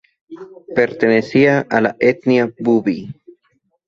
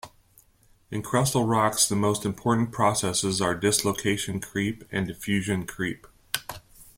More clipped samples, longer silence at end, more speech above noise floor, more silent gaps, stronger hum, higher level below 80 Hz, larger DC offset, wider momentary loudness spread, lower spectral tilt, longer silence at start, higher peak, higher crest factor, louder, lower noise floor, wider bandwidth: neither; first, 0.75 s vs 0.15 s; first, 49 dB vs 35 dB; neither; neither; about the same, -58 dBFS vs -54 dBFS; neither; first, 15 LU vs 10 LU; first, -7.5 dB/octave vs -4 dB/octave; first, 0.3 s vs 0.05 s; about the same, -2 dBFS vs -4 dBFS; second, 16 dB vs 22 dB; first, -16 LUFS vs -26 LUFS; first, -64 dBFS vs -60 dBFS; second, 7.4 kHz vs 16.5 kHz